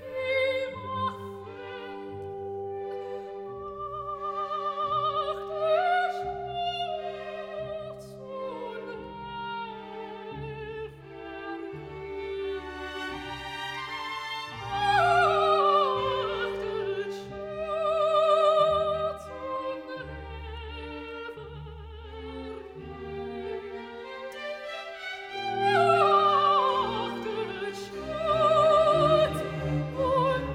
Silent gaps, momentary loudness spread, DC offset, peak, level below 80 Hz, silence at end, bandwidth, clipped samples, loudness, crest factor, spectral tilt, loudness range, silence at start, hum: none; 18 LU; under 0.1%; -10 dBFS; -52 dBFS; 0 s; 15.5 kHz; under 0.1%; -28 LUFS; 18 dB; -5.5 dB/octave; 13 LU; 0 s; none